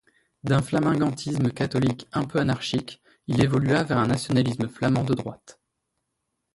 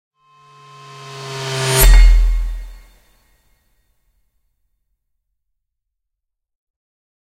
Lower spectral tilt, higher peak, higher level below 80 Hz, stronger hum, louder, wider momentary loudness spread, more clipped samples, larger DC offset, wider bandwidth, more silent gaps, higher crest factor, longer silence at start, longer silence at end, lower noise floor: first, -6.5 dB/octave vs -3.5 dB/octave; second, -8 dBFS vs 0 dBFS; second, -52 dBFS vs -18 dBFS; neither; second, -24 LUFS vs -15 LUFS; second, 7 LU vs 26 LU; neither; neither; second, 11.5 kHz vs 16.5 kHz; neither; about the same, 18 dB vs 18 dB; second, 0.45 s vs 1.05 s; second, 1.05 s vs 4.5 s; about the same, -79 dBFS vs -78 dBFS